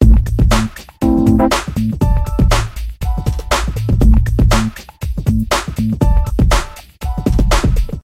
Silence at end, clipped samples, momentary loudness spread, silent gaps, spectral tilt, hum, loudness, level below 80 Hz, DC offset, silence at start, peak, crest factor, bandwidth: 0.05 s; under 0.1%; 11 LU; none; -6 dB/octave; none; -15 LUFS; -16 dBFS; 0.4%; 0 s; 0 dBFS; 14 dB; 15.5 kHz